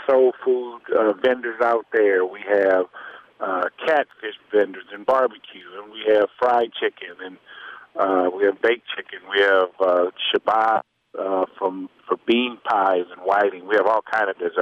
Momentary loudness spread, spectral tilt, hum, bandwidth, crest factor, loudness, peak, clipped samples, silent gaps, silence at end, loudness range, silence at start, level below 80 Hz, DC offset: 16 LU; -5 dB/octave; none; 7 kHz; 14 dB; -21 LUFS; -6 dBFS; under 0.1%; none; 0 s; 3 LU; 0 s; -70 dBFS; under 0.1%